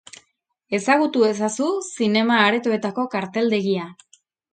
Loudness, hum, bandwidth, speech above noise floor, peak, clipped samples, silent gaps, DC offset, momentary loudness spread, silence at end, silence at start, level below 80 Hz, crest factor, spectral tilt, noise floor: -20 LUFS; none; 9.4 kHz; 48 dB; -2 dBFS; under 0.1%; none; under 0.1%; 8 LU; 0.6 s; 0.7 s; -70 dBFS; 20 dB; -4.5 dB/octave; -68 dBFS